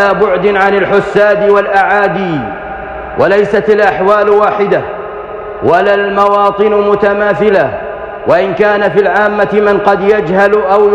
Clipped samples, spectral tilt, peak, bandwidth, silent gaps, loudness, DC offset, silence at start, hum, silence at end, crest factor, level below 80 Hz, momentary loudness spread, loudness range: under 0.1%; -7 dB/octave; 0 dBFS; 7.8 kHz; none; -9 LUFS; under 0.1%; 0 s; none; 0 s; 10 dB; -40 dBFS; 12 LU; 1 LU